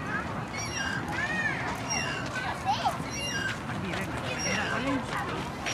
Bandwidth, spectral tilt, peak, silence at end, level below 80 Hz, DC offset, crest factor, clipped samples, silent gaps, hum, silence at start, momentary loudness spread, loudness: 16 kHz; -3.5 dB/octave; -14 dBFS; 0 s; -50 dBFS; under 0.1%; 16 dB; under 0.1%; none; none; 0 s; 5 LU; -31 LUFS